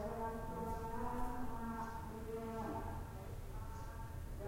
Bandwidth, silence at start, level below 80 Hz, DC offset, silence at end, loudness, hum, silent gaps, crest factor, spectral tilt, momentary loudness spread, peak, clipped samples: 16 kHz; 0 s; -50 dBFS; under 0.1%; 0 s; -46 LUFS; none; none; 16 dB; -7 dB/octave; 6 LU; -28 dBFS; under 0.1%